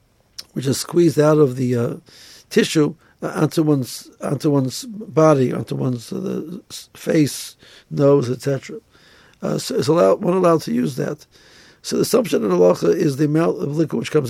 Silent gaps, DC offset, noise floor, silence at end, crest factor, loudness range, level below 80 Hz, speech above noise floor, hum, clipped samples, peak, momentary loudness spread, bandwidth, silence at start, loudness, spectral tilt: none; under 0.1%; -50 dBFS; 0 s; 16 dB; 3 LU; -60 dBFS; 32 dB; none; under 0.1%; -2 dBFS; 15 LU; 16 kHz; 0.4 s; -19 LUFS; -6 dB/octave